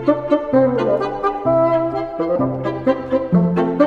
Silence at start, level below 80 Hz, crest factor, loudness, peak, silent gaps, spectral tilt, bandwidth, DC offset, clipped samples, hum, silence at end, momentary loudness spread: 0 s; -46 dBFS; 16 dB; -18 LUFS; -2 dBFS; none; -9.5 dB/octave; 6.6 kHz; under 0.1%; under 0.1%; none; 0 s; 5 LU